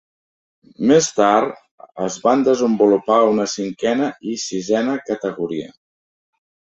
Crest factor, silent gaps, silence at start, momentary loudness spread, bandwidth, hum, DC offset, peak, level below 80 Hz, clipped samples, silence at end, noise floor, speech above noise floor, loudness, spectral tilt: 18 dB; 1.71-1.78 s; 0.8 s; 11 LU; 8.2 kHz; none; under 0.1%; -2 dBFS; -62 dBFS; under 0.1%; 1 s; under -90 dBFS; over 73 dB; -18 LUFS; -4.5 dB/octave